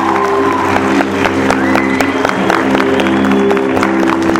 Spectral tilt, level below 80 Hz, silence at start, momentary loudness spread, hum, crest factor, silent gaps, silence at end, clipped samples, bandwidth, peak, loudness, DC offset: -5.5 dB/octave; -42 dBFS; 0 s; 2 LU; none; 12 dB; none; 0 s; 0.2%; 17 kHz; 0 dBFS; -12 LUFS; under 0.1%